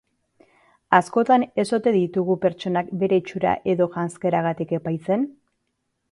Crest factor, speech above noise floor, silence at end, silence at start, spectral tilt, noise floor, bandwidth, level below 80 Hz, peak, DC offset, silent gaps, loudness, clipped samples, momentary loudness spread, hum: 22 dB; 54 dB; 0.8 s; 0.9 s; -7 dB/octave; -75 dBFS; 11.5 kHz; -62 dBFS; -2 dBFS; under 0.1%; none; -22 LUFS; under 0.1%; 7 LU; none